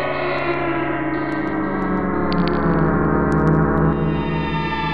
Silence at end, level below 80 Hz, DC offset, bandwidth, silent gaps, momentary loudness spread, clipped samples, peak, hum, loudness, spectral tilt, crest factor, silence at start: 0 s; -32 dBFS; 2%; 5.4 kHz; none; 5 LU; under 0.1%; -6 dBFS; none; -20 LUFS; -9 dB/octave; 14 dB; 0 s